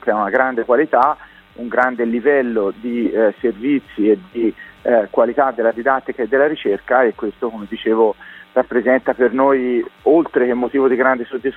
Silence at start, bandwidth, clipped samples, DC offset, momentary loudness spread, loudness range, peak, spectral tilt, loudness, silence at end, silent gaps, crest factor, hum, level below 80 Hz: 0.05 s; 4.2 kHz; under 0.1%; under 0.1%; 7 LU; 2 LU; 0 dBFS; -8 dB/octave; -17 LUFS; 0 s; none; 16 dB; none; -54 dBFS